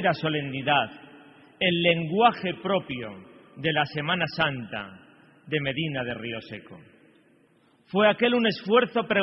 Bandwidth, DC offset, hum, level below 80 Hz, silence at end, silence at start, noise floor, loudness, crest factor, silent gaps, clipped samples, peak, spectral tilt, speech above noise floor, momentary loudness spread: 6 kHz; under 0.1%; none; -62 dBFS; 0 s; 0 s; -62 dBFS; -25 LUFS; 20 dB; none; under 0.1%; -6 dBFS; -8.5 dB/octave; 36 dB; 14 LU